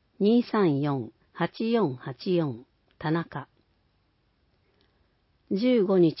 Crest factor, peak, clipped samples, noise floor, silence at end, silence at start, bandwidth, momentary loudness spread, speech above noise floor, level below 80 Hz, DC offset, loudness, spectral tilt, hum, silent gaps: 16 dB; -12 dBFS; under 0.1%; -69 dBFS; 0 s; 0.2 s; 5.8 kHz; 13 LU; 44 dB; -68 dBFS; under 0.1%; -26 LUFS; -11.5 dB/octave; none; none